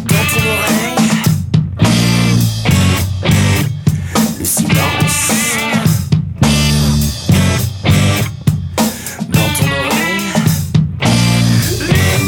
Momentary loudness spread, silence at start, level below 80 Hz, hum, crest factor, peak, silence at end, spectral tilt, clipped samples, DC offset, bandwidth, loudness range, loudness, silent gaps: 4 LU; 0 s; -30 dBFS; none; 12 dB; 0 dBFS; 0 s; -4.5 dB/octave; under 0.1%; under 0.1%; 18 kHz; 1 LU; -13 LUFS; none